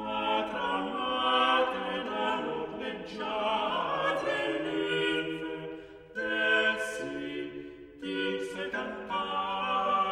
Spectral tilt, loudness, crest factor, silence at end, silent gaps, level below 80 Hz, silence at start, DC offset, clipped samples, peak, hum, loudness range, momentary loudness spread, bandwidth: -4 dB/octave; -30 LUFS; 16 dB; 0 s; none; -64 dBFS; 0 s; under 0.1%; under 0.1%; -14 dBFS; none; 2 LU; 12 LU; 14.5 kHz